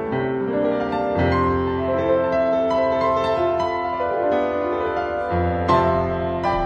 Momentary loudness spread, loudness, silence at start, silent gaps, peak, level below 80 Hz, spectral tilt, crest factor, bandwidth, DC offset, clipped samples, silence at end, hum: 4 LU; -21 LUFS; 0 s; none; -4 dBFS; -40 dBFS; -8 dB/octave; 16 dB; 9 kHz; under 0.1%; under 0.1%; 0 s; none